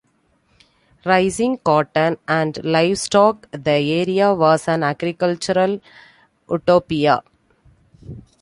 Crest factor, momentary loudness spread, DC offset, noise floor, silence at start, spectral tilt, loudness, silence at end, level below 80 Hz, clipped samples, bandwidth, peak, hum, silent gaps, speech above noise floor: 18 dB; 9 LU; under 0.1%; -62 dBFS; 1.05 s; -5.5 dB/octave; -18 LUFS; 0.2 s; -54 dBFS; under 0.1%; 11.5 kHz; -2 dBFS; none; none; 45 dB